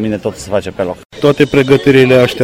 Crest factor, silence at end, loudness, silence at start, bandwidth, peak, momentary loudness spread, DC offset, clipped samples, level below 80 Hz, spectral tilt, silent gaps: 10 dB; 0 s; -11 LUFS; 0 s; 16 kHz; 0 dBFS; 12 LU; under 0.1%; 0.1%; -40 dBFS; -6 dB/octave; 1.05-1.10 s